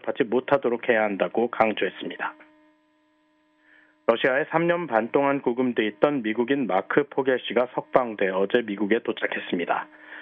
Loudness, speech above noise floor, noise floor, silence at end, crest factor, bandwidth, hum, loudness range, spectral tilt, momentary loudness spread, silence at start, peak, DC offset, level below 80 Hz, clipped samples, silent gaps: -24 LUFS; 41 dB; -65 dBFS; 0 s; 20 dB; 4.9 kHz; none; 4 LU; -8 dB/octave; 6 LU; 0.05 s; -4 dBFS; under 0.1%; -70 dBFS; under 0.1%; none